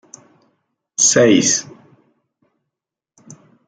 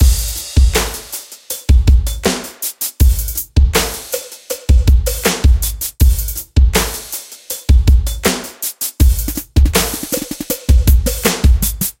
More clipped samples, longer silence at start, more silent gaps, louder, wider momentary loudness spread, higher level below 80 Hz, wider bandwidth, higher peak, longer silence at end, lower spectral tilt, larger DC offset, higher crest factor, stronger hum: neither; first, 1 s vs 0 s; neither; about the same, -13 LUFS vs -15 LUFS; about the same, 10 LU vs 11 LU; second, -64 dBFS vs -14 dBFS; second, 10.5 kHz vs 17 kHz; about the same, -2 dBFS vs 0 dBFS; first, 2.05 s vs 0.1 s; second, -2.5 dB/octave vs -4.5 dB/octave; neither; first, 20 dB vs 14 dB; neither